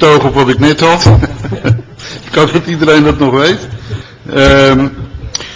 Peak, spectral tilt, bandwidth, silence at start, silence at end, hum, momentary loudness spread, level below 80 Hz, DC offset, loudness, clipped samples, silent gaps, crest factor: 0 dBFS; -5.5 dB/octave; 8 kHz; 0 s; 0 s; none; 17 LU; -24 dBFS; under 0.1%; -9 LUFS; 1%; none; 10 dB